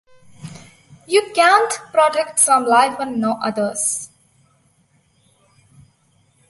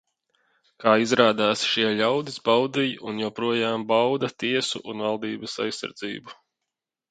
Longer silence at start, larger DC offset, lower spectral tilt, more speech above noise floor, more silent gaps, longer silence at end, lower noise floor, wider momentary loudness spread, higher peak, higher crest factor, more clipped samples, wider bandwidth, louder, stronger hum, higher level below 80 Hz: second, 0.4 s vs 0.8 s; neither; second, -2 dB/octave vs -4 dB/octave; second, 43 dB vs 61 dB; neither; first, 2.45 s vs 0.75 s; second, -59 dBFS vs -85 dBFS; first, 19 LU vs 11 LU; about the same, -2 dBFS vs -2 dBFS; second, 18 dB vs 24 dB; neither; first, 12 kHz vs 9.4 kHz; first, -16 LUFS vs -24 LUFS; neither; about the same, -66 dBFS vs -70 dBFS